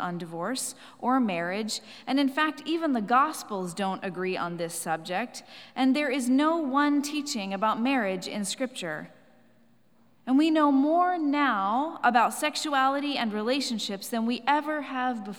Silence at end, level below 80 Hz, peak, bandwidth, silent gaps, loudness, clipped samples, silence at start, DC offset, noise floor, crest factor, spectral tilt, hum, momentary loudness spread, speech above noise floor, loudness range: 0 s; -86 dBFS; -8 dBFS; 18.5 kHz; none; -27 LUFS; under 0.1%; 0 s; under 0.1%; -64 dBFS; 20 dB; -4 dB/octave; none; 10 LU; 37 dB; 4 LU